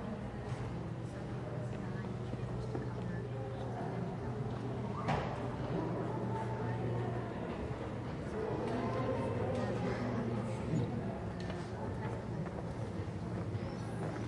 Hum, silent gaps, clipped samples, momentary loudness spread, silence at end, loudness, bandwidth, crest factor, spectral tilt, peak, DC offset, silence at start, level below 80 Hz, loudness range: none; none; under 0.1%; 5 LU; 0 s; -39 LUFS; 11 kHz; 16 dB; -8 dB/octave; -22 dBFS; under 0.1%; 0 s; -54 dBFS; 4 LU